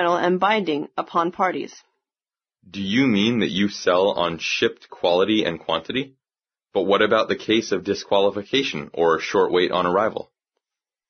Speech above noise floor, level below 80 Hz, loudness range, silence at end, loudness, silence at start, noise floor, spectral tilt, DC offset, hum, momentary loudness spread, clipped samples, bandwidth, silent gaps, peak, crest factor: over 69 dB; -60 dBFS; 2 LU; 0.85 s; -21 LUFS; 0 s; under -90 dBFS; -3 dB/octave; under 0.1%; none; 8 LU; under 0.1%; 6.6 kHz; none; -4 dBFS; 18 dB